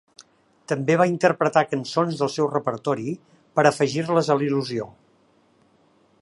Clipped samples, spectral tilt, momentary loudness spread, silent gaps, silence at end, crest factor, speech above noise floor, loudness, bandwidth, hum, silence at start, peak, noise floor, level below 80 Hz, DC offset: under 0.1%; -6 dB/octave; 10 LU; none; 1.3 s; 22 dB; 39 dB; -22 LUFS; 11.5 kHz; none; 0.7 s; -2 dBFS; -60 dBFS; -70 dBFS; under 0.1%